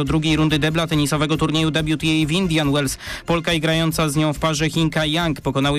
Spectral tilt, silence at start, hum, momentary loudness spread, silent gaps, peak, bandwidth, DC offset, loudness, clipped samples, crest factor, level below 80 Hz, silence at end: -5 dB/octave; 0 s; none; 3 LU; none; -10 dBFS; 15.5 kHz; under 0.1%; -19 LUFS; under 0.1%; 10 dB; -38 dBFS; 0 s